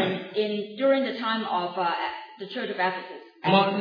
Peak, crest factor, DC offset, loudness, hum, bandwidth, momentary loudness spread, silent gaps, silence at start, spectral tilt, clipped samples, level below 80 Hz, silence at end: -6 dBFS; 20 dB; under 0.1%; -26 LUFS; none; 5.2 kHz; 13 LU; none; 0 s; -7.5 dB/octave; under 0.1%; -78 dBFS; 0 s